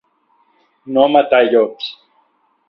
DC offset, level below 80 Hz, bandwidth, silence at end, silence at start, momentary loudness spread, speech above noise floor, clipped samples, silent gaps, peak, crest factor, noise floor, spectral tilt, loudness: under 0.1%; -60 dBFS; 5.8 kHz; 0.75 s; 0.85 s; 14 LU; 47 dB; under 0.1%; none; 0 dBFS; 16 dB; -60 dBFS; -7 dB/octave; -14 LUFS